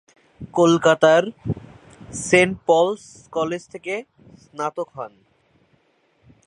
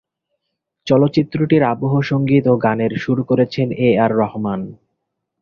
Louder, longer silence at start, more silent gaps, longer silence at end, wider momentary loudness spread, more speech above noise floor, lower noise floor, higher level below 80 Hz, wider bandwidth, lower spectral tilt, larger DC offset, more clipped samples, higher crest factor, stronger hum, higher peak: second, -20 LUFS vs -17 LUFS; second, 0.4 s vs 0.85 s; neither; first, 1.4 s vs 0.7 s; first, 19 LU vs 8 LU; second, 43 dB vs 60 dB; second, -63 dBFS vs -76 dBFS; about the same, -54 dBFS vs -52 dBFS; first, 11 kHz vs 6.8 kHz; second, -5 dB/octave vs -8.5 dB/octave; neither; neither; first, 22 dB vs 16 dB; neither; about the same, 0 dBFS vs -2 dBFS